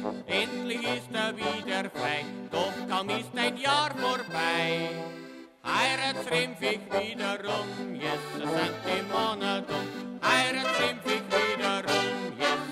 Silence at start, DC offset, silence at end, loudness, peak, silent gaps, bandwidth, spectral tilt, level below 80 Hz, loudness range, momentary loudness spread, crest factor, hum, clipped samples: 0 s; under 0.1%; 0 s; -29 LUFS; -12 dBFS; none; 16 kHz; -3.5 dB/octave; -68 dBFS; 3 LU; 7 LU; 18 dB; none; under 0.1%